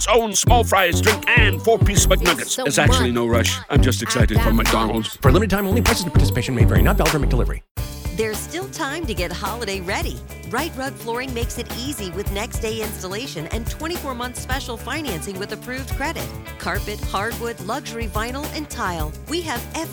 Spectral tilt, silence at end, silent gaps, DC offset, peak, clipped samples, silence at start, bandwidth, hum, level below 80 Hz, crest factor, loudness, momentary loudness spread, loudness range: -4.5 dB/octave; 0 s; 7.71-7.75 s; under 0.1%; -2 dBFS; under 0.1%; 0 s; over 20 kHz; none; -26 dBFS; 18 dB; -21 LUFS; 12 LU; 10 LU